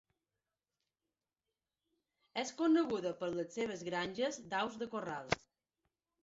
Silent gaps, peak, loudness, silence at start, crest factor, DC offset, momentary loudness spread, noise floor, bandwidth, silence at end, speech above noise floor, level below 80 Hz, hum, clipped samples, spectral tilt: none; -16 dBFS; -38 LUFS; 2.35 s; 24 dB; under 0.1%; 9 LU; under -90 dBFS; 7.6 kHz; 0.85 s; over 53 dB; -72 dBFS; none; under 0.1%; -3.5 dB/octave